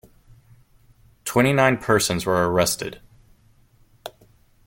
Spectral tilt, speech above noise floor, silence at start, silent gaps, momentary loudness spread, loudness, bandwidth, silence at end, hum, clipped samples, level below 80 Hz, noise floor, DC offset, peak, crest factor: -4.5 dB/octave; 37 dB; 1.25 s; none; 23 LU; -20 LUFS; 17 kHz; 0.55 s; none; under 0.1%; -52 dBFS; -56 dBFS; under 0.1%; -4 dBFS; 20 dB